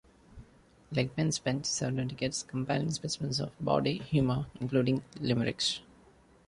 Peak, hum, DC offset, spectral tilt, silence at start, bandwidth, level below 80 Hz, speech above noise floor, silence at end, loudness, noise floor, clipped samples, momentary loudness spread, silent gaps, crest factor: -14 dBFS; none; under 0.1%; -5 dB/octave; 0.3 s; 11.5 kHz; -58 dBFS; 29 dB; 0.65 s; -32 LUFS; -60 dBFS; under 0.1%; 5 LU; none; 18 dB